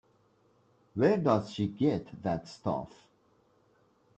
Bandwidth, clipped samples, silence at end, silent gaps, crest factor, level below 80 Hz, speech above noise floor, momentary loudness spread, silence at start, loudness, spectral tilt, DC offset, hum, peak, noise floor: 8.6 kHz; under 0.1%; 1.3 s; none; 22 dB; -66 dBFS; 38 dB; 10 LU; 0.95 s; -31 LUFS; -8 dB/octave; under 0.1%; none; -12 dBFS; -68 dBFS